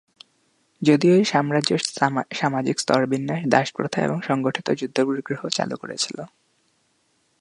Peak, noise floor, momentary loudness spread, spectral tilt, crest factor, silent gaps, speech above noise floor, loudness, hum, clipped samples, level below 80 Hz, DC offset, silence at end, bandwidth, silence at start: 0 dBFS; -67 dBFS; 9 LU; -5 dB/octave; 22 dB; none; 45 dB; -22 LUFS; none; under 0.1%; -68 dBFS; under 0.1%; 1.15 s; 11.5 kHz; 0.8 s